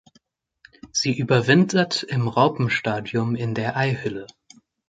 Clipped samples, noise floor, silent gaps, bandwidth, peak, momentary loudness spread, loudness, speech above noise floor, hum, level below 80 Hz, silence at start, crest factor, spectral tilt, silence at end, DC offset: under 0.1%; -63 dBFS; none; 9.2 kHz; -4 dBFS; 9 LU; -22 LUFS; 41 dB; none; -58 dBFS; 0.85 s; 20 dB; -5 dB/octave; 0.65 s; under 0.1%